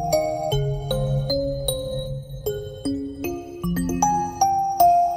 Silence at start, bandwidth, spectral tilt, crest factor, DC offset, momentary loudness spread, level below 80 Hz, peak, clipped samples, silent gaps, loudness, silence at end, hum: 0 s; 16 kHz; -5.5 dB/octave; 18 dB; under 0.1%; 11 LU; -38 dBFS; -6 dBFS; under 0.1%; none; -24 LUFS; 0 s; none